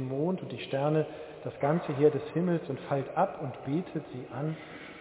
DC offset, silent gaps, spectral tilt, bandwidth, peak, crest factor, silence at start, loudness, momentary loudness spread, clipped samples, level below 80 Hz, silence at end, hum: under 0.1%; none; -7 dB/octave; 4 kHz; -12 dBFS; 20 dB; 0 s; -31 LUFS; 13 LU; under 0.1%; -68 dBFS; 0 s; none